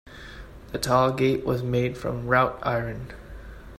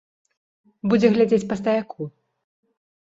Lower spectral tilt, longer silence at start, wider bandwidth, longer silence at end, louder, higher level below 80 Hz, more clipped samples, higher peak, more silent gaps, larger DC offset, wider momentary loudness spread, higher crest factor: about the same, -6 dB/octave vs -7 dB/octave; second, 0.05 s vs 0.85 s; first, 14 kHz vs 7.8 kHz; second, 0 s vs 1.05 s; second, -24 LUFS vs -20 LUFS; first, -44 dBFS vs -60 dBFS; neither; about the same, -6 dBFS vs -4 dBFS; neither; neither; first, 21 LU vs 17 LU; about the same, 20 dB vs 20 dB